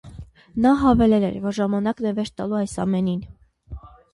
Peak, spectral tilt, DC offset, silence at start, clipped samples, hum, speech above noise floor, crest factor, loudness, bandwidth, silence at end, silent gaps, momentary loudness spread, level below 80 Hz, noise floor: -6 dBFS; -7.5 dB/octave; under 0.1%; 0.05 s; under 0.1%; none; 21 dB; 16 dB; -21 LUFS; 11.5 kHz; 0.25 s; none; 25 LU; -42 dBFS; -41 dBFS